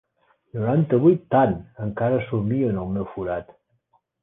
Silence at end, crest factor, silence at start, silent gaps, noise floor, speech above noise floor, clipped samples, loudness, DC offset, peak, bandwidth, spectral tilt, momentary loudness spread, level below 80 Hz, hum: 0.8 s; 18 dB; 0.55 s; none; -67 dBFS; 45 dB; under 0.1%; -22 LUFS; under 0.1%; -6 dBFS; 3.8 kHz; -12 dB/octave; 12 LU; -50 dBFS; none